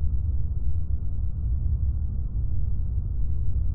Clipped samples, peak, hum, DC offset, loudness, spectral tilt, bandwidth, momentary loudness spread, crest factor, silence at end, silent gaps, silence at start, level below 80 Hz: under 0.1%; -12 dBFS; none; under 0.1%; -30 LUFS; -15.5 dB/octave; 1.4 kHz; 3 LU; 10 dB; 0 s; none; 0 s; -28 dBFS